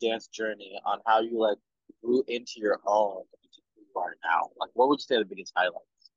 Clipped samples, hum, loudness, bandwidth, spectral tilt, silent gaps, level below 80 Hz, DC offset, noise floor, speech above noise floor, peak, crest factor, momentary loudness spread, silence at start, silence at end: under 0.1%; none; -28 LUFS; 7.6 kHz; -3.5 dB/octave; none; -84 dBFS; under 0.1%; -61 dBFS; 33 dB; -10 dBFS; 18 dB; 10 LU; 0 s; 0.4 s